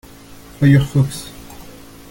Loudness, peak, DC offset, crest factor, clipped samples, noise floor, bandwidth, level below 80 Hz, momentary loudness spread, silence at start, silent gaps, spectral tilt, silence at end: -15 LUFS; -2 dBFS; under 0.1%; 18 dB; under 0.1%; -39 dBFS; 17 kHz; -40 dBFS; 24 LU; 0.6 s; none; -7 dB/octave; 0.5 s